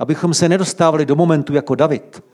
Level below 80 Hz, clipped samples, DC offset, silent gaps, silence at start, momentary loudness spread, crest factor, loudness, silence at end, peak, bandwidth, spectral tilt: -60 dBFS; under 0.1%; under 0.1%; none; 0 s; 4 LU; 14 dB; -15 LUFS; 0.15 s; -2 dBFS; 12 kHz; -5.5 dB/octave